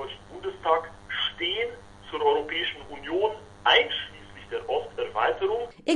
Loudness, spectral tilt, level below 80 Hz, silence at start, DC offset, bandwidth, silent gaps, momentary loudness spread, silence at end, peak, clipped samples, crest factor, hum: -27 LUFS; -3.5 dB/octave; -56 dBFS; 0 s; under 0.1%; 11 kHz; none; 16 LU; 0 s; -6 dBFS; under 0.1%; 22 dB; none